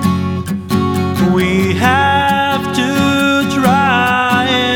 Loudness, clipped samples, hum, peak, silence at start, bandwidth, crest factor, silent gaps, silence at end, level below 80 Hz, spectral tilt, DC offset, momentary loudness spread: -13 LUFS; under 0.1%; none; 0 dBFS; 0 s; 18.5 kHz; 12 dB; none; 0 s; -40 dBFS; -5.5 dB/octave; under 0.1%; 5 LU